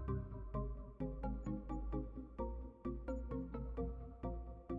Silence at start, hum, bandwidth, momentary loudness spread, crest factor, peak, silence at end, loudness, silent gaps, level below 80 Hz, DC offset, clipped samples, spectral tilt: 0 s; none; 7.2 kHz; 4 LU; 16 dB; -28 dBFS; 0 s; -46 LUFS; none; -48 dBFS; under 0.1%; under 0.1%; -10.5 dB/octave